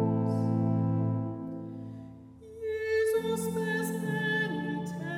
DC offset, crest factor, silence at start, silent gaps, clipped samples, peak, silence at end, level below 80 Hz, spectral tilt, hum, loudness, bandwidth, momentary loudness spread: under 0.1%; 14 dB; 0 s; none; under 0.1%; -18 dBFS; 0 s; -64 dBFS; -6.5 dB/octave; none; -31 LUFS; 16.5 kHz; 15 LU